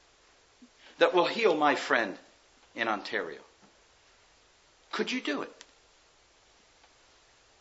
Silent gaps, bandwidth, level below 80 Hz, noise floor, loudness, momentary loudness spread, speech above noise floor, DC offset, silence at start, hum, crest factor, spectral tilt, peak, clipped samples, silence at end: none; 8 kHz; -76 dBFS; -63 dBFS; -29 LUFS; 18 LU; 34 dB; under 0.1%; 0.6 s; none; 26 dB; -3.5 dB/octave; -8 dBFS; under 0.1%; 2.1 s